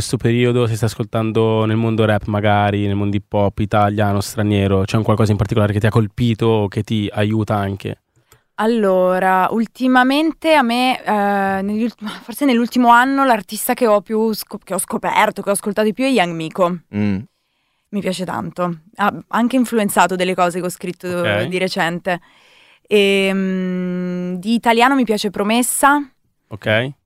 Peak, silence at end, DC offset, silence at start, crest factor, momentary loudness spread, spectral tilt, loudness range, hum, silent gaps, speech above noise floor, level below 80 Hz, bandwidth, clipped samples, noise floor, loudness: 0 dBFS; 0.15 s; under 0.1%; 0 s; 16 dB; 9 LU; -5.5 dB/octave; 3 LU; none; none; 50 dB; -48 dBFS; 16 kHz; under 0.1%; -67 dBFS; -17 LUFS